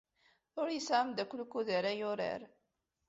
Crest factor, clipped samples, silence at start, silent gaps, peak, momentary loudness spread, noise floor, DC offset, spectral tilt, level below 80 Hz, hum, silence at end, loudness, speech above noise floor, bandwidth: 20 dB; under 0.1%; 0.55 s; none; -18 dBFS; 7 LU; -84 dBFS; under 0.1%; -2.5 dB/octave; -80 dBFS; none; 0.6 s; -36 LUFS; 48 dB; 7.6 kHz